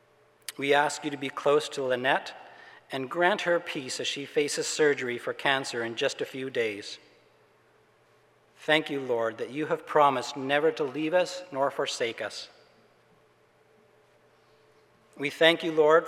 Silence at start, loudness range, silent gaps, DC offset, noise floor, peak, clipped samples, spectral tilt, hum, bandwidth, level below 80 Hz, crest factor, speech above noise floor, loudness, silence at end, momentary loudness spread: 0.5 s; 7 LU; none; under 0.1%; -63 dBFS; -6 dBFS; under 0.1%; -3 dB/octave; none; 15 kHz; -84 dBFS; 22 dB; 36 dB; -27 LUFS; 0 s; 14 LU